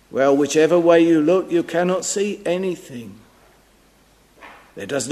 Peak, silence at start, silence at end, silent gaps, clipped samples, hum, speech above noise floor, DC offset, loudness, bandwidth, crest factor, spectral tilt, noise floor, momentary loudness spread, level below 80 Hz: -2 dBFS; 0.15 s; 0 s; none; under 0.1%; none; 37 dB; under 0.1%; -18 LUFS; 13.5 kHz; 18 dB; -5 dB/octave; -55 dBFS; 17 LU; -60 dBFS